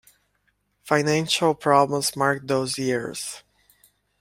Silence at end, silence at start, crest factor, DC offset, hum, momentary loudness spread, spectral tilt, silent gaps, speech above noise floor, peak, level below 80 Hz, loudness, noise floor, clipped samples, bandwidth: 0.8 s; 0.85 s; 22 dB; under 0.1%; 50 Hz at -50 dBFS; 12 LU; -4 dB/octave; none; 47 dB; -2 dBFS; -62 dBFS; -22 LUFS; -70 dBFS; under 0.1%; 16.5 kHz